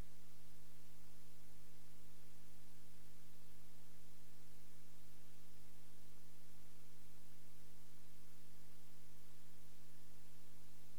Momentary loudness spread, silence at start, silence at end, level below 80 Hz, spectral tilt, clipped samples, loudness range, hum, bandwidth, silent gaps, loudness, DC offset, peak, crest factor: 0 LU; 0 s; 0 s; -80 dBFS; -4.5 dB/octave; under 0.1%; 0 LU; 50 Hz at -70 dBFS; 19 kHz; none; -66 LUFS; 1%; -36 dBFS; 12 dB